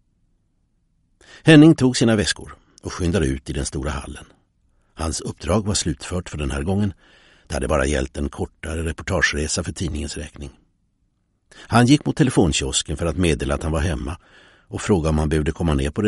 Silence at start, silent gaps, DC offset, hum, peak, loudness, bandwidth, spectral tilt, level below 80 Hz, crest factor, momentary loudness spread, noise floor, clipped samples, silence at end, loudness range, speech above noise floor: 1.35 s; none; under 0.1%; none; -2 dBFS; -20 LUFS; 11.5 kHz; -5 dB/octave; -32 dBFS; 20 dB; 15 LU; -67 dBFS; under 0.1%; 0 s; 8 LU; 47 dB